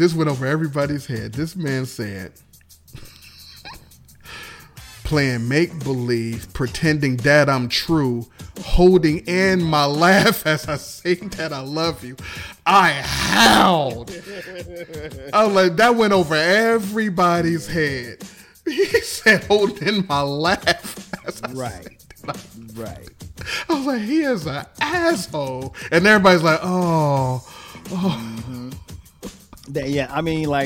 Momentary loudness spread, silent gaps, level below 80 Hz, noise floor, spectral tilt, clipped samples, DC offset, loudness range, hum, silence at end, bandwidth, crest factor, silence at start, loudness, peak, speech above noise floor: 20 LU; none; -38 dBFS; -47 dBFS; -5 dB/octave; under 0.1%; under 0.1%; 9 LU; none; 0 s; 17 kHz; 18 dB; 0 s; -18 LUFS; -2 dBFS; 27 dB